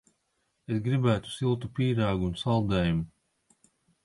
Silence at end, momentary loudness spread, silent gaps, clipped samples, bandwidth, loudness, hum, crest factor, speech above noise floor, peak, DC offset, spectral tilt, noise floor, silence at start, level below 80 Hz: 0.95 s; 6 LU; none; under 0.1%; 11.5 kHz; -28 LUFS; none; 18 dB; 49 dB; -12 dBFS; under 0.1%; -7.5 dB/octave; -76 dBFS; 0.7 s; -48 dBFS